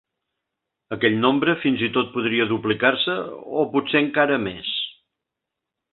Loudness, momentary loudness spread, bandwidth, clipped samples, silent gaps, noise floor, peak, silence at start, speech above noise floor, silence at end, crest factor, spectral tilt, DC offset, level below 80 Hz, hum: -21 LUFS; 8 LU; 4.3 kHz; under 0.1%; none; -84 dBFS; -2 dBFS; 0.9 s; 63 dB; 1 s; 20 dB; -10 dB/octave; under 0.1%; -60 dBFS; none